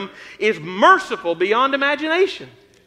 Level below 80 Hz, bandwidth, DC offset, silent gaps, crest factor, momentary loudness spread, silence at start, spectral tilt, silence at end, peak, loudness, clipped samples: -66 dBFS; 11.5 kHz; under 0.1%; none; 18 dB; 10 LU; 0 s; -4 dB/octave; 0.4 s; -2 dBFS; -17 LUFS; under 0.1%